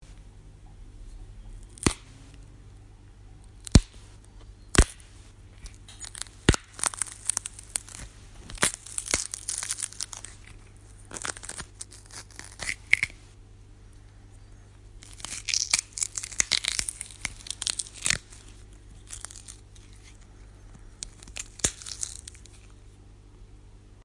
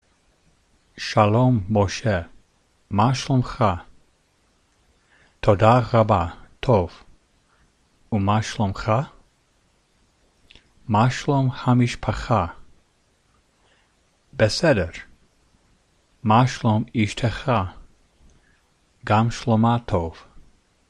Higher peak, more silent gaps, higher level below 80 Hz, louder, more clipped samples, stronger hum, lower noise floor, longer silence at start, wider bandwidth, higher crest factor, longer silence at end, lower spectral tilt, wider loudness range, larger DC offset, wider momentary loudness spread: about the same, 0 dBFS vs -2 dBFS; neither; about the same, -40 dBFS vs -44 dBFS; second, -29 LUFS vs -21 LUFS; neither; first, 50 Hz at -50 dBFS vs none; second, -50 dBFS vs -63 dBFS; second, 0 s vs 0.95 s; about the same, 11.5 kHz vs 10.5 kHz; first, 32 dB vs 22 dB; second, 0 s vs 0.5 s; second, -2.5 dB/octave vs -6.5 dB/octave; first, 8 LU vs 5 LU; neither; first, 27 LU vs 13 LU